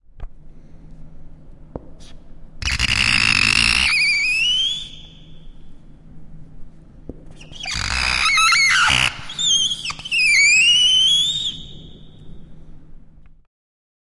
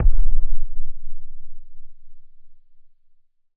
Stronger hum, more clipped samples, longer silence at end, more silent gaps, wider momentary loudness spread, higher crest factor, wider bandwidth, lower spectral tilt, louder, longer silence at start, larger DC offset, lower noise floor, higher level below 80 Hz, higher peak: neither; neither; about the same, 1.1 s vs 1.05 s; neither; second, 14 LU vs 24 LU; first, 20 dB vs 12 dB; first, 11.5 kHz vs 0.4 kHz; second, 0 dB/octave vs -12 dB/octave; first, -15 LUFS vs -31 LUFS; first, 0.15 s vs 0 s; neither; second, -42 dBFS vs -53 dBFS; second, -38 dBFS vs -22 dBFS; about the same, -2 dBFS vs -2 dBFS